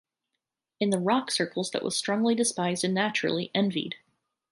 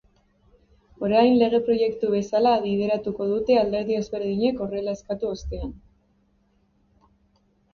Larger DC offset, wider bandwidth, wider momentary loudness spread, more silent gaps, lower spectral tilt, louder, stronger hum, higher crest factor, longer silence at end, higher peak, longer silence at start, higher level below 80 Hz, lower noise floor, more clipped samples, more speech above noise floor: neither; first, 11.5 kHz vs 7 kHz; second, 6 LU vs 11 LU; neither; second, -4 dB/octave vs -6.5 dB/octave; second, -27 LUFS vs -23 LUFS; neither; about the same, 18 dB vs 18 dB; second, 0.55 s vs 1.95 s; second, -10 dBFS vs -6 dBFS; second, 0.8 s vs 1 s; second, -74 dBFS vs -46 dBFS; first, -85 dBFS vs -65 dBFS; neither; first, 58 dB vs 42 dB